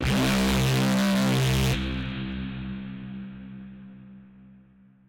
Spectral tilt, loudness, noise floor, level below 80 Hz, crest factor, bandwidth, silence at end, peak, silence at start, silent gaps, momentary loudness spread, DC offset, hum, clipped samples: -5 dB/octave; -25 LUFS; -55 dBFS; -38 dBFS; 8 dB; 17 kHz; 0.5 s; -18 dBFS; 0 s; none; 20 LU; under 0.1%; none; under 0.1%